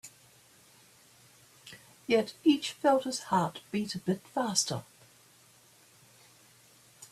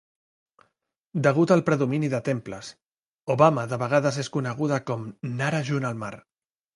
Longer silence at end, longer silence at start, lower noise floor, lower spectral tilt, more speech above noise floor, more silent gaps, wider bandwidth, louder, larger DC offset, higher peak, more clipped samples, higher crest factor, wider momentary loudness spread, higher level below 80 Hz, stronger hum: second, 0.05 s vs 0.55 s; second, 0.05 s vs 1.15 s; second, -61 dBFS vs -75 dBFS; second, -4 dB/octave vs -6.5 dB/octave; second, 31 dB vs 51 dB; second, none vs 2.86-2.90 s, 3.11-3.27 s; first, 14.5 kHz vs 11.5 kHz; second, -30 LUFS vs -25 LUFS; neither; second, -10 dBFS vs -4 dBFS; neither; about the same, 22 dB vs 22 dB; first, 23 LU vs 15 LU; second, -74 dBFS vs -66 dBFS; neither